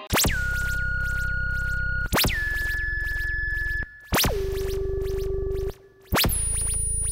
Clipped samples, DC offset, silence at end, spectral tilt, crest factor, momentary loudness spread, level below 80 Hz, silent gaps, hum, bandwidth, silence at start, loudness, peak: under 0.1%; under 0.1%; 0 s; -3 dB/octave; 14 dB; 7 LU; -30 dBFS; none; none; 16.5 kHz; 0 s; -25 LUFS; -12 dBFS